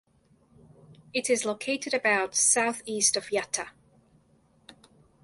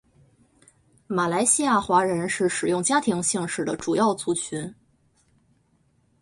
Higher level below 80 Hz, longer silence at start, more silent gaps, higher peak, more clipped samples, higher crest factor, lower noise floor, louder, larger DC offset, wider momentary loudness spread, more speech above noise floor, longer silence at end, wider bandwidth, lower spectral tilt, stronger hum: second, -70 dBFS vs -62 dBFS; second, 0.9 s vs 1.1 s; neither; about the same, -8 dBFS vs -6 dBFS; neither; about the same, 22 dB vs 20 dB; about the same, -64 dBFS vs -65 dBFS; second, -26 LUFS vs -23 LUFS; neither; first, 11 LU vs 8 LU; second, 37 dB vs 42 dB; second, 0.5 s vs 1.5 s; about the same, 12 kHz vs 11.5 kHz; second, -1 dB/octave vs -3.5 dB/octave; neither